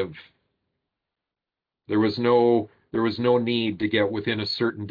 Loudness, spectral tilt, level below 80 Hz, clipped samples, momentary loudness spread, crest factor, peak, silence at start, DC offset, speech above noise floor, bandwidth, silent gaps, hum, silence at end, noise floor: -23 LUFS; -8 dB/octave; -64 dBFS; under 0.1%; 7 LU; 16 dB; -8 dBFS; 0 s; under 0.1%; 66 dB; 5.2 kHz; none; none; 0 s; -88 dBFS